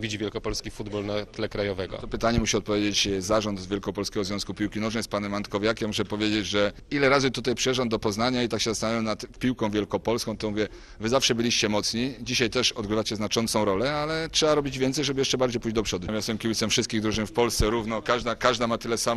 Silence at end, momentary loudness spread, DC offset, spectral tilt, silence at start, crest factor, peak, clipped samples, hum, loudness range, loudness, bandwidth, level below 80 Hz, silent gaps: 0 s; 7 LU; under 0.1%; -4 dB/octave; 0 s; 22 dB; -4 dBFS; under 0.1%; none; 3 LU; -26 LUFS; 13.5 kHz; -44 dBFS; none